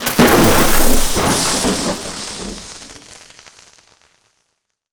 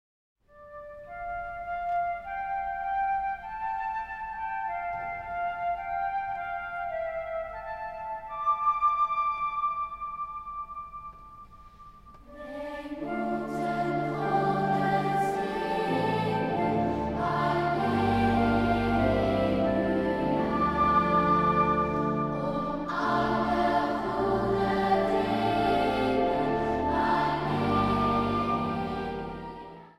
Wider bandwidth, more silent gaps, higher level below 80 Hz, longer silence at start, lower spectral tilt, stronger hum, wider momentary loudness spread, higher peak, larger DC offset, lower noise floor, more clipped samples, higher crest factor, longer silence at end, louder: first, over 20 kHz vs 13.5 kHz; neither; first, -24 dBFS vs -48 dBFS; second, 0 s vs 0.55 s; second, -3.5 dB/octave vs -7.5 dB/octave; neither; first, 22 LU vs 12 LU; first, 0 dBFS vs -12 dBFS; neither; first, -71 dBFS vs -50 dBFS; neither; about the same, 16 dB vs 16 dB; first, 1.8 s vs 0.1 s; first, -14 LUFS vs -28 LUFS